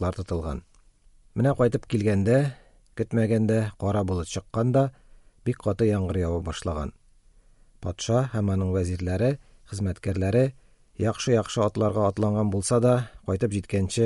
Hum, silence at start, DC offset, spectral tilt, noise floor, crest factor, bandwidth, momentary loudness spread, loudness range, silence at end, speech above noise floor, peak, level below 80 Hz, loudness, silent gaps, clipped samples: none; 0 s; under 0.1%; -7 dB/octave; -56 dBFS; 16 dB; 11.5 kHz; 11 LU; 4 LU; 0 s; 32 dB; -8 dBFS; -46 dBFS; -26 LUFS; none; under 0.1%